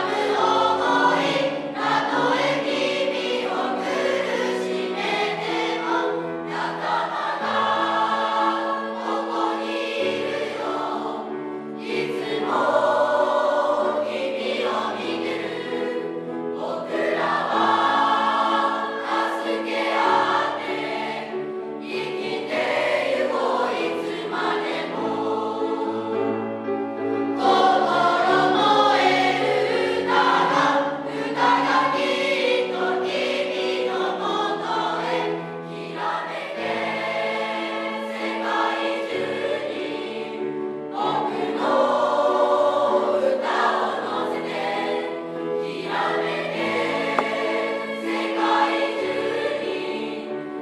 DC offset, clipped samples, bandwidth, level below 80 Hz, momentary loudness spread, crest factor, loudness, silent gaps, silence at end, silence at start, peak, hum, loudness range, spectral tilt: under 0.1%; under 0.1%; 12.5 kHz; -72 dBFS; 9 LU; 20 dB; -23 LUFS; none; 0 s; 0 s; -4 dBFS; none; 6 LU; -4 dB/octave